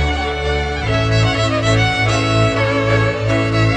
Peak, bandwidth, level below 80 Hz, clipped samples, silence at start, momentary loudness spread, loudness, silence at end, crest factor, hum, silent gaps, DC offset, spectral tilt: -2 dBFS; 9.4 kHz; -28 dBFS; under 0.1%; 0 s; 4 LU; -16 LUFS; 0 s; 12 dB; none; none; under 0.1%; -5.5 dB/octave